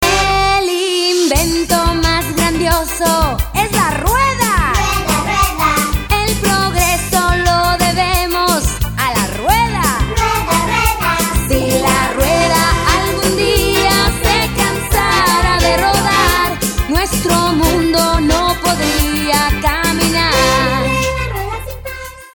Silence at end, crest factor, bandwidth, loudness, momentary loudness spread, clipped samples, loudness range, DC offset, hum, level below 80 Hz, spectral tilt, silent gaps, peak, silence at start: 0.05 s; 14 dB; over 20 kHz; -13 LUFS; 4 LU; under 0.1%; 2 LU; under 0.1%; none; -22 dBFS; -3.5 dB/octave; none; 0 dBFS; 0 s